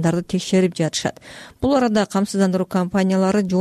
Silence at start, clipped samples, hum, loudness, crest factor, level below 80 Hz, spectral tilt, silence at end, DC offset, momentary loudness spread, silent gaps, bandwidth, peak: 0 s; under 0.1%; none; -20 LUFS; 12 dB; -48 dBFS; -6 dB/octave; 0 s; under 0.1%; 7 LU; none; 13 kHz; -8 dBFS